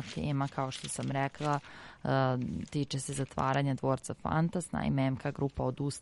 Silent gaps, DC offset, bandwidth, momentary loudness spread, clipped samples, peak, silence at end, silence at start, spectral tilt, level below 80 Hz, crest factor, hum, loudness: none; under 0.1%; 11.5 kHz; 6 LU; under 0.1%; -16 dBFS; 0 s; 0 s; -6 dB/octave; -56 dBFS; 16 dB; none; -33 LUFS